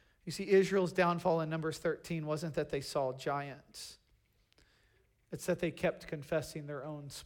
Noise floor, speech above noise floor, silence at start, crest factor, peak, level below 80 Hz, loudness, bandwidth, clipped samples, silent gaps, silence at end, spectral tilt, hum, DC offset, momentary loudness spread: -72 dBFS; 37 dB; 0.25 s; 20 dB; -16 dBFS; -66 dBFS; -35 LUFS; 17.5 kHz; under 0.1%; none; 0 s; -5.5 dB/octave; none; under 0.1%; 15 LU